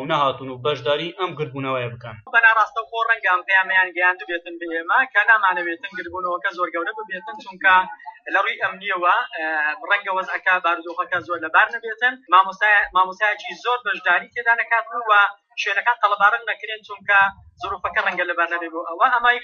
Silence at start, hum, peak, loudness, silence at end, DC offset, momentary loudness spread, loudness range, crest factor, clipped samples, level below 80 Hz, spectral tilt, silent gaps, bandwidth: 0 s; none; 0 dBFS; -19 LUFS; 0 s; under 0.1%; 12 LU; 3 LU; 20 dB; under 0.1%; -62 dBFS; -0.5 dB/octave; none; 7 kHz